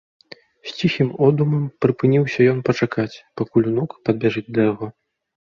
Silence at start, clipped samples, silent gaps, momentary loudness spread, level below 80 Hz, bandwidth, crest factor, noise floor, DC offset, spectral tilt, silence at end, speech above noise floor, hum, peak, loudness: 0.65 s; under 0.1%; none; 11 LU; -58 dBFS; 7.2 kHz; 18 dB; -39 dBFS; under 0.1%; -8 dB/octave; 0.5 s; 20 dB; none; -2 dBFS; -20 LUFS